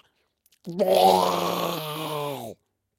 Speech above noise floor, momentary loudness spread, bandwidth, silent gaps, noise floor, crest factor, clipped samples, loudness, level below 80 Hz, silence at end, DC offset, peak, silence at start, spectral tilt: 46 dB; 19 LU; 16.5 kHz; none; -68 dBFS; 20 dB; under 0.1%; -23 LUFS; -68 dBFS; 0.45 s; under 0.1%; -6 dBFS; 0.65 s; -4.5 dB/octave